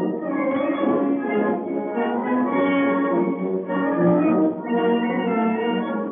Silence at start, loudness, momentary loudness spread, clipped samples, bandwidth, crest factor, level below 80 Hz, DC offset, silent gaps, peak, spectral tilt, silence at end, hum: 0 s; -22 LUFS; 5 LU; under 0.1%; 3.6 kHz; 14 dB; under -90 dBFS; under 0.1%; none; -8 dBFS; -6 dB/octave; 0 s; none